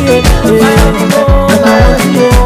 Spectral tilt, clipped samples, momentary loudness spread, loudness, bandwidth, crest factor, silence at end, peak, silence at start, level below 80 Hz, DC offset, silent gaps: -5.5 dB/octave; 2%; 2 LU; -7 LUFS; 16 kHz; 6 dB; 0 s; 0 dBFS; 0 s; -12 dBFS; under 0.1%; none